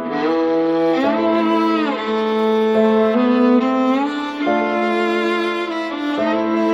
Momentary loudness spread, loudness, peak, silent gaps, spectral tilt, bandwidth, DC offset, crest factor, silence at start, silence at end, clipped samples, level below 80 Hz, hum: 6 LU; -17 LUFS; -4 dBFS; none; -6 dB/octave; 11 kHz; under 0.1%; 14 dB; 0 s; 0 s; under 0.1%; -62 dBFS; none